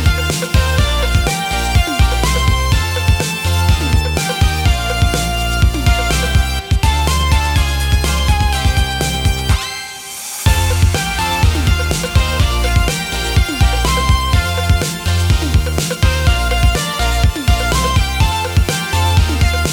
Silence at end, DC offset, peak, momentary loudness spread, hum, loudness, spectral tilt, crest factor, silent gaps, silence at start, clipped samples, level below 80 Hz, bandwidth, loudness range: 0 s; under 0.1%; -2 dBFS; 3 LU; none; -15 LUFS; -4 dB/octave; 12 dB; none; 0 s; under 0.1%; -18 dBFS; 18.5 kHz; 1 LU